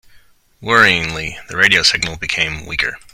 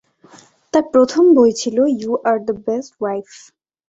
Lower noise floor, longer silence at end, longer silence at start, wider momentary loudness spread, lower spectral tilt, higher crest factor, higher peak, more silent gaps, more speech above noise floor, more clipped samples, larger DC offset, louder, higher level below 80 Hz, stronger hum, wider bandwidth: about the same, -48 dBFS vs -47 dBFS; second, 0.15 s vs 0.65 s; second, 0.6 s vs 0.75 s; about the same, 13 LU vs 12 LU; second, -2 dB/octave vs -5 dB/octave; about the same, 18 dB vs 16 dB; about the same, 0 dBFS vs -2 dBFS; neither; about the same, 31 dB vs 31 dB; first, 0.1% vs under 0.1%; neither; about the same, -14 LUFS vs -16 LUFS; first, -42 dBFS vs -60 dBFS; neither; first, over 20 kHz vs 8 kHz